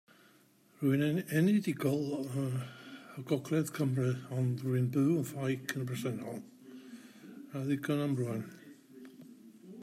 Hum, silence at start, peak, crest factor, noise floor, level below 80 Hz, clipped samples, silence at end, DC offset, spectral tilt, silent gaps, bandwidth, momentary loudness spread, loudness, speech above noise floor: none; 0.8 s; -16 dBFS; 18 dB; -65 dBFS; -76 dBFS; under 0.1%; 0 s; under 0.1%; -7 dB/octave; none; 16 kHz; 22 LU; -34 LUFS; 32 dB